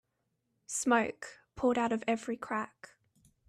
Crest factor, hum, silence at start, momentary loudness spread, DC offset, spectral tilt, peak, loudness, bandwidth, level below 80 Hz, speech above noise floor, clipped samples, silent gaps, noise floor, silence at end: 20 dB; none; 0.7 s; 14 LU; under 0.1%; -3.5 dB/octave; -14 dBFS; -32 LUFS; 14.5 kHz; -68 dBFS; 49 dB; under 0.1%; none; -81 dBFS; 0.8 s